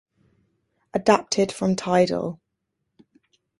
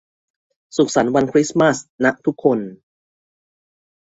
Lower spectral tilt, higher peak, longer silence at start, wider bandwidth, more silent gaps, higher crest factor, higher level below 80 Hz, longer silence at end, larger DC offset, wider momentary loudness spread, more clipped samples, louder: about the same, -5 dB/octave vs -5 dB/octave; about the same, -4 dBFS vs -2 dBFS; first, 0.95 s vs 0.75 s; first, 11.5 kHz vs 8 kHz; second, none vs 1.89-1.98 s; about the same, 22 dB vs 18 dB; about the same, -60 dBFS vs -58 dBFS; about the same, 1.25 s vs 1.3 s; neither; first, 11 LU vs 7 LU; neither; second, -22 LUFS vs -18 LUFS